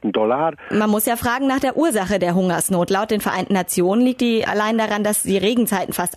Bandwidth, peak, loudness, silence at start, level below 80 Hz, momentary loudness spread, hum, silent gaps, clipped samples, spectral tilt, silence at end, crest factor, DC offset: 14 kHz; -8 dBFS; -19 LUFS; 0.05 s; -50 dBFS; 3 LU; none; none; under 0.1%; -4.5 dB/octave; 0 s; 10 dB; under 0.1%